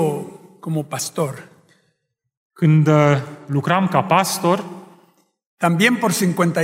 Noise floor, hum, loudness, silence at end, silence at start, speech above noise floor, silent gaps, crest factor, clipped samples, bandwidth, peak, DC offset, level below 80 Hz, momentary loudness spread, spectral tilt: -71 dBFS; none; -18 LUFS; 0 s; 0 s; 54 dB; 2.37-2.50 s, 5.46-5.58 s; 18 dB; under 0.1%; 16 kHz; -2 dBFS; under 0.1%; -64 dBFS; 12 LU; -5.5 dB/octave